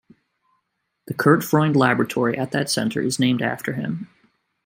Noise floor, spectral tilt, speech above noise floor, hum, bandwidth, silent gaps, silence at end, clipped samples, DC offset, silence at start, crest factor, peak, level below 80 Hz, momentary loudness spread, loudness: -75 dBFS; -5.5 dB/octave; 54 dB; none; 16.5 kHz; none; 0.6 s; under 0.1%; under 0.1%; 1.1 s; 20 dB; -2 dBFS; -64 dBFS; 12 LU; -21 LUFS